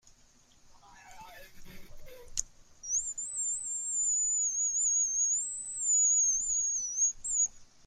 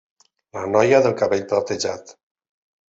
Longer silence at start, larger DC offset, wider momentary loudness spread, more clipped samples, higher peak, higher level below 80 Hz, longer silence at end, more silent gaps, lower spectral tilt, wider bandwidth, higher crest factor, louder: about the same, 0.65 s vs 0.55 s; neither; second, 11 LU vs 16 LU; neither; second, -10 dBFS vs -2 dBFS; first, -58 dBFS vs -64 dBFS; second, 0.2 s vs 0.75 s; neither; second, 1.5 dB/octave vs -4.5 dB/octave; first, 16 kHz vs 8 kHz; about the same, 22 dB vs 20 dB; second, -28 LUFS vs -19 LUFS